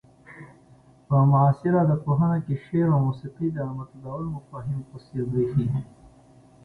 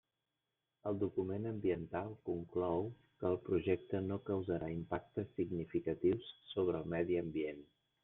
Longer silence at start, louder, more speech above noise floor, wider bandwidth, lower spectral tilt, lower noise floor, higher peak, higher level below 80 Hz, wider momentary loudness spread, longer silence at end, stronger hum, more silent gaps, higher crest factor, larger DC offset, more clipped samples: second, 0.3 s vs 0.85 s; first, -24 LUFS vs -39 LUFS; second, 31 dB vs 51 dB; first, 4.5 kHz vs 3.9 kHz; about the same, -11 dB/octave vs -10.5 dB/octave; second, -54 dBFS vs -89 dBFS; first, -8 dBFS vs -20 dBFS; first, -54 dBFS vs -68 dBFS; first, 16 LU vs 7 LU; first, 0.8 s vs 0.4 s; neither; neither; about the same, 18 dB vs 18 dB; neither; neither